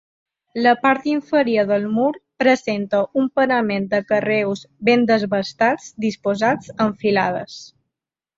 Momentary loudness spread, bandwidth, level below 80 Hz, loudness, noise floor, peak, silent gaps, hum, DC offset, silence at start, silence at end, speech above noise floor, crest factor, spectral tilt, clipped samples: 6 LU; 7.8 kHz; -62 dBFS; -19 LUFS; -85 dBFS; -2 dBFS; none; none; under 0.1%; 0.55 s; 0.7 s; 66 dB; 18 dB; -5.5 dB/octave; under 0.1%